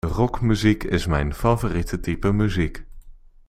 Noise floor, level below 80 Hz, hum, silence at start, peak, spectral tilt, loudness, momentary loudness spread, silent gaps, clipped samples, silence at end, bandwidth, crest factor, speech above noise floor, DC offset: -43 dBFS; -32 dBFS; none; 0.05 s; -4 dBFS; -7 dB/octave; -22 LUFS; 7 LU; none; under 0.1%; 0.3 s; 15.5 kHz; 18 dB; 22 dB; under 0.1%